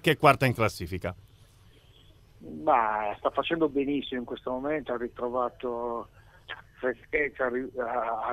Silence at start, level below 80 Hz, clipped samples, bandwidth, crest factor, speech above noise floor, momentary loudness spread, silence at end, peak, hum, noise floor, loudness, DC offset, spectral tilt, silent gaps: 0.05 s; -56 dBFS; under 0.1%; 16 kHz; 24 dB; 28 dB; 14 LU; 0 s; -4 dBFS; none; -56 dBFS; -29 LUFS; under 0.1%; -6 dB/octave; none